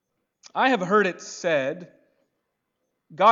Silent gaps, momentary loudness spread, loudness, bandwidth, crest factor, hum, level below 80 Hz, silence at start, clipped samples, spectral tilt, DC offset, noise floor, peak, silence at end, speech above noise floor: none; 12 LU; -23 LUFS; 7.8 kHz; 20 dB; none; -82 dBFS; 0.55 s; under 0.1%; -4.5 dB/octave; under 0.1%; -78 dBFS; -6 dBFS; 0 s; 54 dB